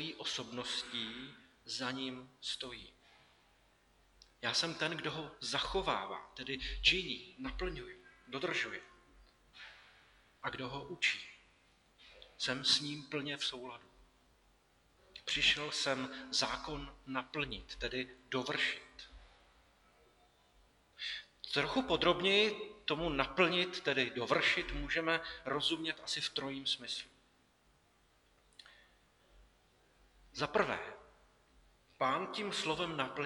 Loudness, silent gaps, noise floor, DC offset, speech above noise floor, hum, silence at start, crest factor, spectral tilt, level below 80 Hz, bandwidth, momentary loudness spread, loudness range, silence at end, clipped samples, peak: -36 LUFS; none; -71 dBFS; under 0.1%; 34 dB; none; 0 s; 26 dB; -3 dB/octave; -58 dBFS; 19 kHz; 18 LU; 10 LU; 0 s; under 0.1%; -14 dBFS